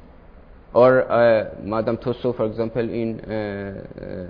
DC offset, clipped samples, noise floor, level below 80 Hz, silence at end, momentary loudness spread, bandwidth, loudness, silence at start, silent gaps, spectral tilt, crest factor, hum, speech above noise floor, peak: under 0.1%; under 0.1%; -45 dBFS; -48 dBFS; 0 s; 15 LU; 5.2 kHz; -21 LUFS; 0.05 s; none; -10 dB/octave; 18 dB; none; 25 dB; -2 dBFS